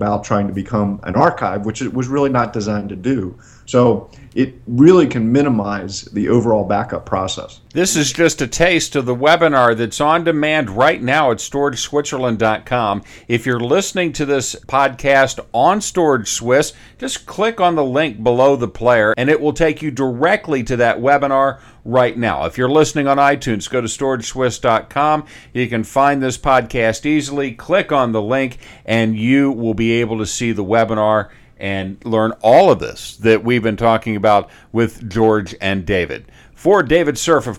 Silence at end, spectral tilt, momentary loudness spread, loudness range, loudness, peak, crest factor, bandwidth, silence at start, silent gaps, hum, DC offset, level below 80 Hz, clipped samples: 0 s; -5 dB/octave; 8 LU; 3 LU; -16 LUFS; 0 dBFS; 16 dB; 16 kHz; 0 s; none; none; under 0.1%; -42 dBFS; under 0.1%